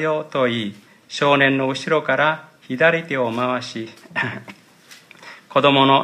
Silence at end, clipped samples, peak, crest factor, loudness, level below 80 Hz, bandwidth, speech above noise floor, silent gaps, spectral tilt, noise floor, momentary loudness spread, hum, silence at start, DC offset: 0 s; under 0.1%; 0 dBFS; 20 dB; -19 LUFS; -70 dBFS; 13 kHz; 29 dB; none; -5 dB/octave; -47 dBFS; 16 LU; none; 0 s; under 0.1%